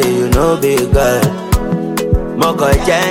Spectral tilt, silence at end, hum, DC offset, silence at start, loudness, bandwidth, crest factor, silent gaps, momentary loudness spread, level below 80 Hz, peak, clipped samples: -5.5 dB/octave; 0 s; none; under 0.1%; 0 s; -13 LUFS; 17 kHz; 12 dB; none; 5 LU; -20 dBFS; 0 dBFS; under 0.1%